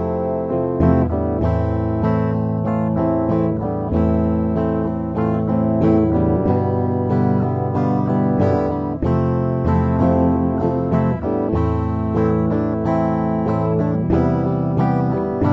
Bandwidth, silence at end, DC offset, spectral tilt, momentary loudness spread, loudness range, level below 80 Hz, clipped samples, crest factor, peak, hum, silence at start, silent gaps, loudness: 6 kHz; 0 s; under 0.1%; -11 dB/octave; 4 LU; 1 LU; -32 dBFS; under 0.1%; 14 dB; -2 dBFS; none; 0 s; none; -19 LUFS